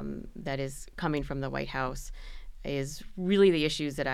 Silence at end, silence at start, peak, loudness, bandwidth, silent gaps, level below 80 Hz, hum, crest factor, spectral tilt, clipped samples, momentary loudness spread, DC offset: 0 s; 0 s; -12 dBFS; -30 LUFS; 14.5 kHz; none; -44 dBFS; none; 18 dB; -5.5 dB/octave; under 0.1%; 19 LU; under 0.1%